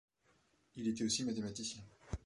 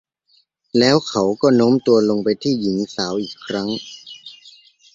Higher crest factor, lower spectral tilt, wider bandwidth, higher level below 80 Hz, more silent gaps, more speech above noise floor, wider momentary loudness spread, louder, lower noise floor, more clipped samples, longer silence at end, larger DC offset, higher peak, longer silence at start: about the same, 18 dB vs 18 dB; second, -3.5 dB/octave vs -5.5 dB/octave; first, 11.5 kHz vs 7.8 kHz; about the same, -58 dBFS vs -58 dBFS; neither; second, 34 dB vs 43 dB; second, 15 LU vs 20 LU; second, -40 LUFS vs -18 LUFS; first, -75 dBFS vs -61 dBFS; neither; second, 0.1 s vs 0.6 s; neither; second, -24 dBFS vs -2 dBFS; about the same, 0.75 s vs 0.75 s